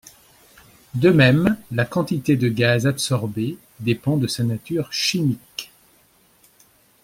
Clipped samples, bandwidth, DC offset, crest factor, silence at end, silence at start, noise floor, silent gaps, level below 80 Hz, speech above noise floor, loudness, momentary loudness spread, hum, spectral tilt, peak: under 0.1%; 16.5 kHz; under 0.1%; 20 dB; 1.4 s; 0.95 s; -57 dBFS; none; -54 dBFS; 38 dB; -20 LUFS; 14 LU; none; -5.5 dB/octave; -2 dBFS